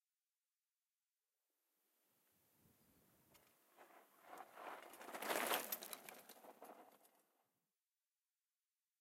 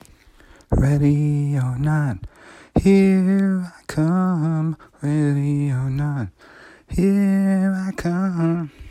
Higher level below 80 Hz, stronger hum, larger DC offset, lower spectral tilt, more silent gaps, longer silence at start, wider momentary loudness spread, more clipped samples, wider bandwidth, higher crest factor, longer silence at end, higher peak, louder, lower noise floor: second, under -90 dBFS vs -38 dBFS; neither; neither; second, -0.5 dB/octave vs -8.5 dB/octave; neither; first, 2.65 s vs 0.7 s; first, 26 LU vs 10 LU; neither; first, 16 kHz vs 12 kHz; first, 30 dB vs 14 dB; first, 1.95 s vs 0 s; second, -24 dBFS vs -4 dBFS; second, -46 LUFS vs -20 LUFS; first, under -90 dBFS vs -49 dBFS